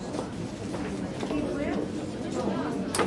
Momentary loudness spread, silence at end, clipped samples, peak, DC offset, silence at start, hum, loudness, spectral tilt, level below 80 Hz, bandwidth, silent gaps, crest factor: 5 LU; 0 s; under 0.1%; -12 dBFS; under 0.1%; 0 s; none; -32 LUFS; -5.5 dB/octave; -50 dBFS; 11.5 kHz; none; 20 dB